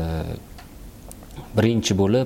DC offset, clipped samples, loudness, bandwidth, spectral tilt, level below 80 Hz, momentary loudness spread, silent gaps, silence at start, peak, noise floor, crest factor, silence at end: under 0.1%; under 0.1%; -22 LUFS; 17 kHz; -6 dB/octave; -40 dBFS; 23 LU; none; 0 s; -6 dBFS; -41 dBFS; 16 dB; 0 s